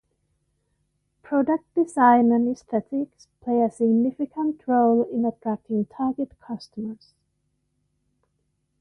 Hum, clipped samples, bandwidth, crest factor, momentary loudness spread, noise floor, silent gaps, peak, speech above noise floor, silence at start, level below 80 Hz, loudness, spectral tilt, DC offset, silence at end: none; under 0.1%; 10 kHz; 20 dB; 16 LU; -73 dBFS; none; -4 dBFS; 51 dB; 1.3 s; -66 dBFS; -23 LUFS; -7.5 dB/octave; under 0.1%; 1.85 s